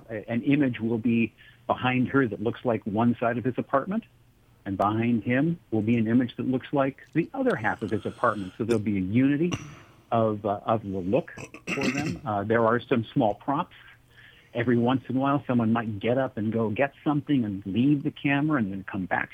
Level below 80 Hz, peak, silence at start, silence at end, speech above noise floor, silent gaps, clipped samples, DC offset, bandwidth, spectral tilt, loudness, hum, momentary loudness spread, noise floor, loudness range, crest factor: -60 dBFS; -8 dBFS; 0.1 s; 0.05 s; 28 dB; none; under 0.1%; under 0.1%; 10 kHz; -7.5 dB/octave; -26 LUFS; none; 7 LU; -54 dBFS; 1 LU; 18 dB